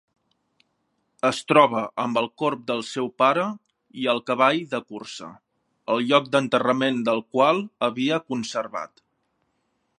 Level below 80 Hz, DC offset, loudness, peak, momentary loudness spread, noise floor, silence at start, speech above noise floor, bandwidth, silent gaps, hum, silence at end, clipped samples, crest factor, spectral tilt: -74 dBFS; under 0.1%; -23 LUFS; -2 dBFS; 16 LU; -73 dBFS; 1.25 s; 50 dB; 11.5 kHz; none; none; 1.15 s; under 0.1%; 22 dB; -5 dB/octave